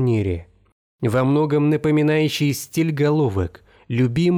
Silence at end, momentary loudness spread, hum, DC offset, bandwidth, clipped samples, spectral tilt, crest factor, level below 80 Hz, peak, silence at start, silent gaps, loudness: 0 s; 9 LU; none; under 0.1%; 19.5 kHz; under 0.1%; -7 dB/octave; 10 dB; -50 dBFS; -8 dBFS; 0 s; 0.72-0.99 s; -20 LUFS